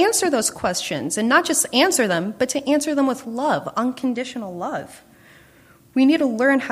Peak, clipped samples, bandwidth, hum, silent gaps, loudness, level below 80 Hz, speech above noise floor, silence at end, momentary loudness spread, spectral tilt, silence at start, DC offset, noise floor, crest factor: -2 dBFS; under 0.1%; 15.5 kHz; none; none; -20 LUFS; -60 dBFS; 31 dB; 0 s; 11 LU; -3 dB/octave; 0 s; under 0.1%; -51 dBFS; 18 dB